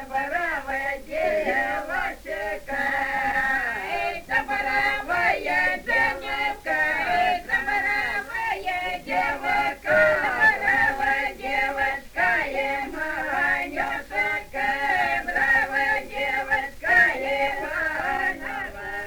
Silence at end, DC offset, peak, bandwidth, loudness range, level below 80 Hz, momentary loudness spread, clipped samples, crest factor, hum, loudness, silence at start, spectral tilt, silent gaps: 0 s; under 0.1%; -6 dBFS; over 20 kHz; 4 LU; -46 dBFS; 8 LU; under 0.1%; 18 dB; none; -23 LUFS; 0 s; -3.5 dB/octave; none